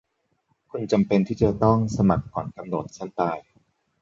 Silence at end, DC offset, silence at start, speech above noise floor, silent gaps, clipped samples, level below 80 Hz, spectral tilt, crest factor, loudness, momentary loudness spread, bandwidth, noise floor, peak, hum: 0.6 s; under 0.1%; 0.75 s; 48 dB; none; under 0.1%; -46 dBFS; -8 dB/octave; 20 dB; -24 LUFS; 13 LU; 7.8 kHz; -71 dBFS; -4 dBFS; none